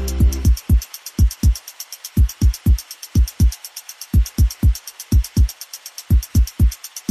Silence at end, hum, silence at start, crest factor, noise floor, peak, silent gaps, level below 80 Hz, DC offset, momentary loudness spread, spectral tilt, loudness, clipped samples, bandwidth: 0.1 s; none; 0 s; 10 dB; -36 dBFS; -6 dBFS; none; -18 dBFS; under 0.1%; 14 LU; -5.5 dB/octave; -19 LUFS; under 0.1%; 14.5 kHz